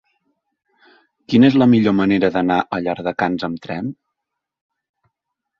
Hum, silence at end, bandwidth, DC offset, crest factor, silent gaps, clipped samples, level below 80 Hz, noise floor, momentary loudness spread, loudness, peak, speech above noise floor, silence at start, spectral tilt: none; 1.65 s; 6.8 kHz; under 0.1%; 18 dB; none; under 0.1%; -54 dBFS; -80 dBFS; 14 LU; -17 LUFS; -2 dBFS; 64 dB; 1.3 s; -8 dB/octave